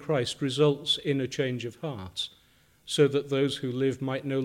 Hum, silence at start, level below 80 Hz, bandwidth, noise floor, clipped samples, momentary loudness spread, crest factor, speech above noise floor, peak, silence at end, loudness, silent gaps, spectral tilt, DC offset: none; 0 s; -66 dBFS; 16 kHz; -62 dBFS; under 0.1%; 10 LU; 18 dB; 34 dB; -10 dBFS; 0 s; -28 LUFS; none; -5.5 dB/octave; under 0.1%